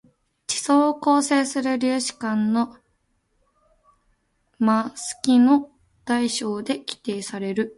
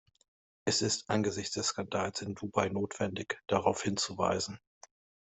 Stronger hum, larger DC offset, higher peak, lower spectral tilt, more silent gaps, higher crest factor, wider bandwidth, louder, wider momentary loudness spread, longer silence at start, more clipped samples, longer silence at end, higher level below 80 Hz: neither; neither; first, -4 dBFS vs -12 dBFS; about the same, -4 dB/octave vs -3.5 dB/octave; neither; about the same, 18 dB vs 22 dB; first, 11.5 kHz vs 8.2 kHz; first, -22 LUFS vs -33 LUFS; first, 11 LU vs 8 LU; second, 0.5 s vs 0.65 s; neither; second, 0.05 s vs 0.8 s; about the same, -66 dBFS vs -68 dBFS